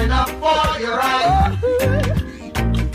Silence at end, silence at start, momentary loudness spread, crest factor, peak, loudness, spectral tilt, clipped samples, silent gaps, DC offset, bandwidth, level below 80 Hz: 0 s; 0 s; 7 LU; 14 dB; -4 dBFS; -18 LUFS; -5.5 dB/octave; under 0.1%; none; under 0.1%; 16 kHz; -24 dBFS